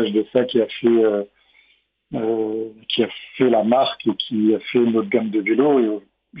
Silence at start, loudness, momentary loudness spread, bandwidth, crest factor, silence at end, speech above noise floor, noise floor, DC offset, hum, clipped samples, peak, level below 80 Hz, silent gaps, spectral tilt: 0 s; -19 LUFS; 9 LU; 5.2 kHz; 16 dB; 0 s; 42 dB; -61 dBFS; under 0.1%; none; under 0.1%; -4 dBFS; -64 dBFS; none; -9.5 dB/octave